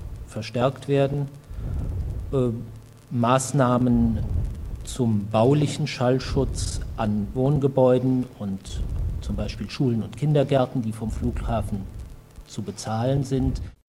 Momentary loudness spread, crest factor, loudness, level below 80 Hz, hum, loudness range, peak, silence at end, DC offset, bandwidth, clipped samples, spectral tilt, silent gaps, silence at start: 14 LU; 20 dB; -24 LUFS; -34 dBFS; none; 4 LU; -4 dBFS; 0.2 s; under 0.1%; 13 kHz; under 0.1%; -7 dB/octave; none; 0 s